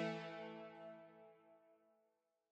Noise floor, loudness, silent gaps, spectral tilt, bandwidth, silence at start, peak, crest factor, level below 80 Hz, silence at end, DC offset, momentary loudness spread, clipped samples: -85 dBFS; -52 LUFS; none; -6 dB/octave; 9 kHz; 0 s; -32 dBFS; 20 dB; under -90 dBFS; 0.6 s; under 0.1%; 18 LU; under 0.1%